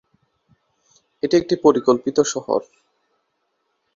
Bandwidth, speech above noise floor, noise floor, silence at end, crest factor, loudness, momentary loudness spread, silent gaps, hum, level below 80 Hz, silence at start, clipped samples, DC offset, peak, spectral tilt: 7.6 kHz; 54 dB; -72 dBFS; 1.35 s; 20 dB; -19 LUFS; 9 LU; none; none; -60 dBFS; 1.25 s; under 0.1%; under 0.1%; -2 dBFS; -4.5 dB/octave